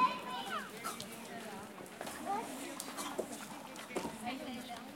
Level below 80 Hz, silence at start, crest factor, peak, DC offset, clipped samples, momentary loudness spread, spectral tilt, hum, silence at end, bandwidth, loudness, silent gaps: -74 dBFS; 0 s; 24 dB; -18 dBFS; under 0.1%; under 0.1%; 7 LU; -3 dB/octave; none; 0 s; 16.5 kHz; -42 LUFS; none